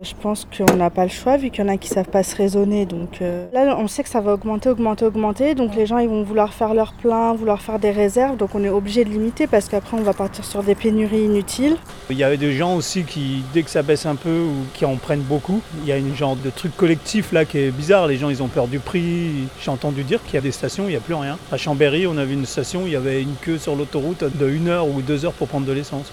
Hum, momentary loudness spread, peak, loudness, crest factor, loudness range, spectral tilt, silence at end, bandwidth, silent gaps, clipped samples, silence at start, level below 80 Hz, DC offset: none; 6 LU; 0 dBFS; -20 LUFS; 20 dB; 3 LU; -6 dB/octave; 0 s; 18.5 kHz; none; under 0.1%; 0 s; -44 dBFS; under 0.1%